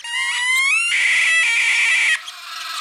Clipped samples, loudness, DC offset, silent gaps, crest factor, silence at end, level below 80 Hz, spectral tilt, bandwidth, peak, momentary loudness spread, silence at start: under 0.1%; -15 LUFS; under 0.1%; none; 12 dB; 0 s; -74 dBFS; 6 dB/octave; over 20 kHz; -6 dBFS; 11 LU; 0.05 s